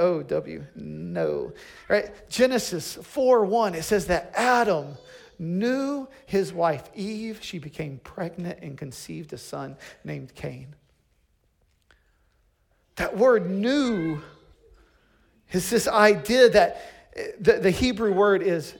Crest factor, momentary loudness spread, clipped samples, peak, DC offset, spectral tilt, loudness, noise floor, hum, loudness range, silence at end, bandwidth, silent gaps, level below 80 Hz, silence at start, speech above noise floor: 20 dB; 18 LU; under 0.1%; -4 dBFS; under 0.1%; -5 dB/octave; -24 LUFS; -67 dBFS; none; 17 LU; 0 s; 18 kHz; none; -52 dBFS; 0 s; 43 dB